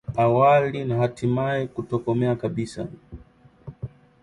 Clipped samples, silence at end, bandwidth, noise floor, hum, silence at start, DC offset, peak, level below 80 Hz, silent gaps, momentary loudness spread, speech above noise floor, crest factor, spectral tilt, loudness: under 0.1%; 0.35 s; 11 kHz; -52 dBFS; none; 0.1 s; under 0.1%; -6 dBFS; -52 dBFS; none; 21 LU; 30 dB; 16 dB; -8 dB/octave; -23 LUFS